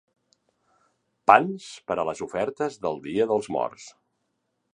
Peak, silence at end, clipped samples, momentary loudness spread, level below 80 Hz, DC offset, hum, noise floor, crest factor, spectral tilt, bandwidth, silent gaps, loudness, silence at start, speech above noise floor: 0 dBFS; 0.85 s; under 0.1%; 14 LU; -66 dBFS; under 0.1%; none; -76 dBFS; 26 dB; -5 dB/octave; 10.5 kHz; none; -25 LUFS; 1.3 s; 52 dB